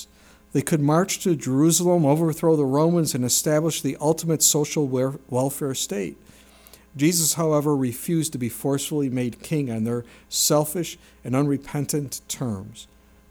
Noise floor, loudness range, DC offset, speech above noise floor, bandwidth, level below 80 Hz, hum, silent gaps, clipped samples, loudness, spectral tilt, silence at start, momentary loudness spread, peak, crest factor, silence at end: -52 dBFS; 4 LU; under 0.1%; 30 dB; over 20 kHz; -58 dBFS; none; none; under 0.1%; -22 LUFS; -4.5 dB/octave; 0 s; 10 LU; -4 dBFS; 18 dB; 0.45 s